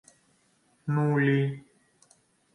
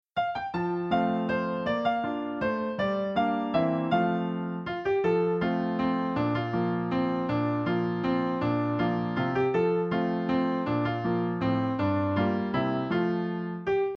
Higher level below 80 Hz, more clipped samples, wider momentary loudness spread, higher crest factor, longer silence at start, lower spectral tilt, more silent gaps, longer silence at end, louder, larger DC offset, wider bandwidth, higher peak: second, -72 dBFS vs -58 dBFS; neither; first, 16 LU vs 4 LU; about the same, 18 dB vs 16 dB; first, 0.85 s vs 0.15 s; about the same, -8.5 dB/octave vs -9 dB/octave; neither; first, 0.95 s vs 0 s; about the same, -26 LUFS vs -28 LUFS; neither; first, 10.5 kHz vs 6.4 kHz; about the same, -12 dBFS vs -12 dBFS